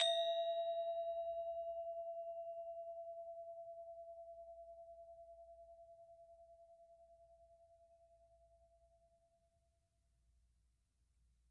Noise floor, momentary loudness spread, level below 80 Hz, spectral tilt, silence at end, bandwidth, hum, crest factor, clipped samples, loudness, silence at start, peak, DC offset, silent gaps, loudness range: -81 dBFS; 24 LU; -80 dBFS; 0 dB/octave; 2.95 s; 8.8 kHz; none; 24 dB; under 0.1%; -45 LUFS; 0 s; -24 dBFS; under 0.1%; none; 22 LU